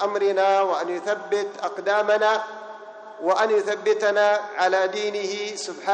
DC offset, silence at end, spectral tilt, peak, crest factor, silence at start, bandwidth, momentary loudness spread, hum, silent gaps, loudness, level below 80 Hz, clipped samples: under 0.1%; 0 s; -2.5 dB/octave; -8 dBFS; 16 dB; 0 s; 9.4 kHz; 10 LU; none; none; -22 LUFS; -80 dBFS; under 0.1%